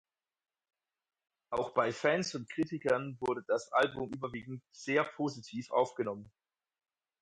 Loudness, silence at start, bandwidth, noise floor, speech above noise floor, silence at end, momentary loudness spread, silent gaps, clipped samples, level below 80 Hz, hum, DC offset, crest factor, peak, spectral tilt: -34 LUFS; 1.5 s; 11 kHz; under -90 dBFS; over 56 dB; 0.95 s; 10 LU; none; under 0.1%; -72 dBFS; none; under 0.1%; 20 dB; -16 dBFS; -5 dB/octave